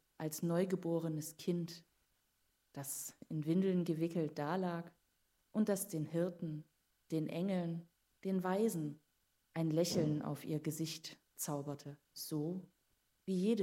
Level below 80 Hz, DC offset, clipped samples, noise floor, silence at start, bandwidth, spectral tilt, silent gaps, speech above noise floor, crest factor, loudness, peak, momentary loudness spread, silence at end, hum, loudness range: -82 dBFS; under 0.1%; under 0.1%; -80 dBFS; 0.2 s; 16 kHz; -6 dB/octave; none; 42 dB; 18 dB; -39 LUFS; -22 dBFS; 13 LU; 0 s; none; 3 LU